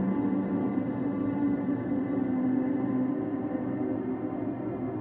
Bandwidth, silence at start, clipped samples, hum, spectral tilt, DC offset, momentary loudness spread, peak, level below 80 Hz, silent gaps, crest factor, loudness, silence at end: 3.4 kHz; 0 s; under 0.1%; none; -12.5 dB/octave; under 0.1%; 5 LU; -16 dBFS; -60 dBFS; none; 12 dB; -30 LUFS; 0 s